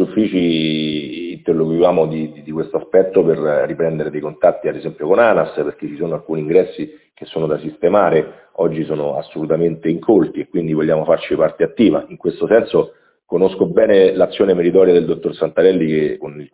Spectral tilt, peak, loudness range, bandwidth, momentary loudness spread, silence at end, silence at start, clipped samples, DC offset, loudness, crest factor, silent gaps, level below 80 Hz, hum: -11 dB/octave; 0 dBFS; 4 LU; 4 kHz; 11 LU; 0.1 s; 0 s; under 0.1%; under 0.1%; -16 LUFS; 16 dB; none; -52 dBFS; none